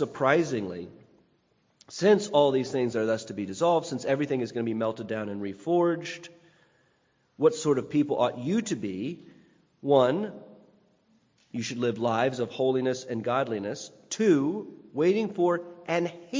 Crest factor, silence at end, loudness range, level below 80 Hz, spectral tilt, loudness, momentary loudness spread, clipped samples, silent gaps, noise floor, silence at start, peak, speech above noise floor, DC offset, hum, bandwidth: 20 dB; 0 s; 4 LU; -70 dBFS; -5.5 dB/octave; -27 LUFS; 14 LU; under 0.1%; none; -69 dBFS; 0 s; -6 dBFS; 42 dB; under 0.1%; none; 7.6 kHz